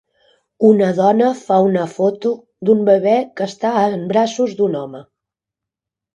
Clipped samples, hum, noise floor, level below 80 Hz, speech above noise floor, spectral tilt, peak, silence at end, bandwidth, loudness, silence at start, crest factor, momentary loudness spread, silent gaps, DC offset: under 0.1%; none; -85 dBFS; -66 dBFS; 70 dB; -7 dB/octave; 0 dBFS; 1.1 s; 9 kHz; -16 LUFS; 0.6 s; 16 dB; 9 LU; none; under 0.1%